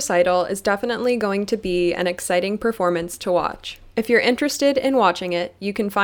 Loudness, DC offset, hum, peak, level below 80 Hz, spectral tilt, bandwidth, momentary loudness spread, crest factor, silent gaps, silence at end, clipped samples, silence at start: -21 LUFS; under 0.1%; none; -4 dBFS; -50 dBFS; -4 dB/octave; 19.5 kHz; 7 LU; 18 dB; none; 0 s; under 0.1%; 0 s